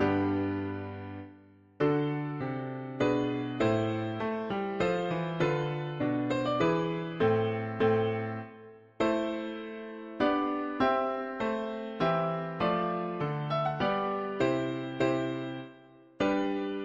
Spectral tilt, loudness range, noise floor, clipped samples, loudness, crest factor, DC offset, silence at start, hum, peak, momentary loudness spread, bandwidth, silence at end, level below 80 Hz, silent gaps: -7.5 dB/octave; 2 LU; -56 dBFS; under 0.1%; -31 LUFS; 16 dB; under 0.1%; 0 s; none; -14 dBFS; 11 LU; 7.4 kHz; 0 s; -60 dBFS; none